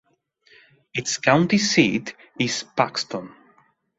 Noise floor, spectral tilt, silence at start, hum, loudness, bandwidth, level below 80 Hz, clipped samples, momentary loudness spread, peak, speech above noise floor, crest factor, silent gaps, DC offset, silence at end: -61 dBFS; -4 dB/octave; 0.95 s; none; -21 LUFS; 8.2 kHz; -62 dBFS; under 0.1%; 13 LU; -2 dBFS; 39 dB; 22 dB; none; under 0.1%; 0.7 s